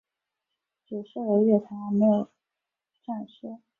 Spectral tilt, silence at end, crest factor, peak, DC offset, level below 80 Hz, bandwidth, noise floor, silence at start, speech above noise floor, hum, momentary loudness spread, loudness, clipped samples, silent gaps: -11 dB/octave; 0.25 s; 18 dB; -10 dBFS; under 0.1%; -74 dBFS; 3.8 kHz; -87 dBFS; 0.9 s; 62 dB; none; 18 LU; -25 LUFS; under 0.1%; none